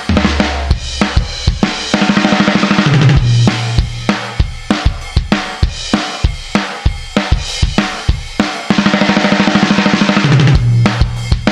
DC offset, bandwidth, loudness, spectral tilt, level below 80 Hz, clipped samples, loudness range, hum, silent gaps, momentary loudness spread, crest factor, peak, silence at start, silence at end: 0.2%; 11 kHz; -13 LUFS; -5.5 dB/octave; -20 dBFS; under 0.1%; 5 LU; none; none; 8 LU; 12 dB; 0 dBFS; 0 s; 0 s